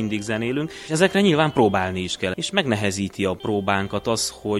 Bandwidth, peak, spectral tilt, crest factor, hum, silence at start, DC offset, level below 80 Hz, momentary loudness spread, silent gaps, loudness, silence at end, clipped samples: 13.5 kHz; -4 dBFS; -4.5 dB/octave; 18 dB; none; 0 s; under 0.1%; -52 dBFS; 7 LU; none; -22 LUFS; 0 s; under 0.1%